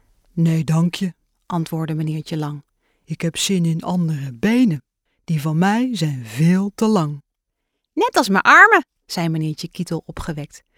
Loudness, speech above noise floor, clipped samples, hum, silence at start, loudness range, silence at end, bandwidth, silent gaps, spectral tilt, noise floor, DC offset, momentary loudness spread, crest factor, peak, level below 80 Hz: -18 LUFS; 59 dB; under 0.1%; none; 0.35 s; 7 LU; 0.2 s; 16.5 kHz; none; -5.5 dB/octave; -77 dBFS; under 0.1%; 15 LU; 20 dB; 0 dBFS; -50 dBFS